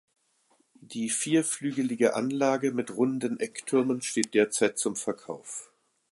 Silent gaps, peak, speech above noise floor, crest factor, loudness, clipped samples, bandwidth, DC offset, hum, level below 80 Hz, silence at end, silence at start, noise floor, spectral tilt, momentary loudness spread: none; -6 dBFS; 41 dB; 22 dB; -28 LUFS; under 0.1%; 11.5 kHz; under 0.1%; none; -78 dBFS; 0.45 s; 0.9 s; -69 dBFS; -4 dB/octave; 12 LU